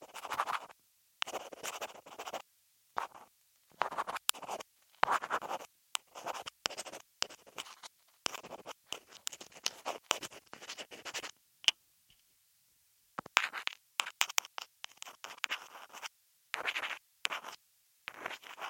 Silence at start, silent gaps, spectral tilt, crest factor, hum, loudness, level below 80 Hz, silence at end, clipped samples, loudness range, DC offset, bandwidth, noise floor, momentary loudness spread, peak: 0 s; none; 0.5 dB/octave; 38 dB; none; -39 LUFS; -84 dBFS; 0 s; under 0.1%; 5 LU; under 0.1%; 16.5 kHz; -71 dBFS; 16 LU; -2 dBFS